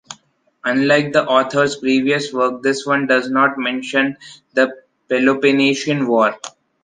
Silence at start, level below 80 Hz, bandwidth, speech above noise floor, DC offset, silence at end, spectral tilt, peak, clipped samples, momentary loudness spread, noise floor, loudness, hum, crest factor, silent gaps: 0.1 s; -64 dBFS; 9.6 kHz; 39 dB; under 0.1%; 0.35 s; -4.5 dB/octave; -2 dBFS; under 0.1%; 9 LU; -55 dBFS; -17 LUFS; none; 16 dB; none